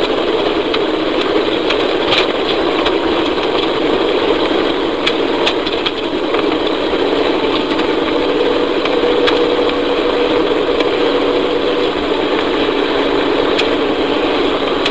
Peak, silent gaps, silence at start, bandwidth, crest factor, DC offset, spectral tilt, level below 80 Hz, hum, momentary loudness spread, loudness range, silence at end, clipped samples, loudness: 0 dBFS; none; 0 s; 8 kHz; 14 dB; 2%; -4.5 dB/octave; -40 dBFS; none; 2 LU; 1 LU; 0 s; under 0.1%; -14 LUFS